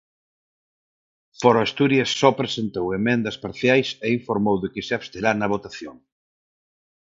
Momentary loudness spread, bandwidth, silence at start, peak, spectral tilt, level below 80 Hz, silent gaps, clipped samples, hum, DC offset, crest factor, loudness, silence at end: 9 LU; 7.8 kHz; 1.4 s; -2 dBFS; -5.5 dB/octave; -56 dBFS; none; under 0.1%; none; under 0.1%; 22 dB; -22 LUFS; 1.25 s